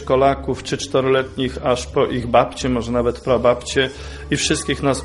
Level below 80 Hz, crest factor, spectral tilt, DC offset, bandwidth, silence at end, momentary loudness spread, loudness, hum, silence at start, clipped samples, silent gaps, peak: -36 dBFS; 18 dB; -4.5 dB/octave; under 0.1%; 11.5 kHz; 0 s; 7 LU; -19 LUFS; none; 0 s; under 0.1%; none; -2 dBFS